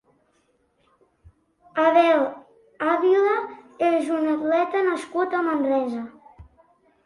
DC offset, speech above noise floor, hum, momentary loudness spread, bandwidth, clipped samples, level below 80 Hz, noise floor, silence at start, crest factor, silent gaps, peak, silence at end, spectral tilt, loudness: under 0.1%; 45 dB; none; 12 LU; 11.5 kHz; under 0.1%; -62 dBFS; -66 dBFS; 1.75 s; 18 dB; none; -6 dBFS; 0.6 s; -5 dB/octave; -22 LUFS